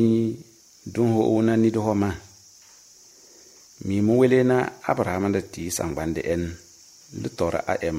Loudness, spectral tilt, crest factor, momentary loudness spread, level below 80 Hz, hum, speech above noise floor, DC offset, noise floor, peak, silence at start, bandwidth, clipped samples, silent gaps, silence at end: -23 LUFS; -6.5 dB/octave; 18 dB; 15 LU; -50 dBFS; none; 29 dB; under 0.1%; -51 dBFS; -6 dBFS; 0 s; 16 kHz; under 0.1%; none; 0 s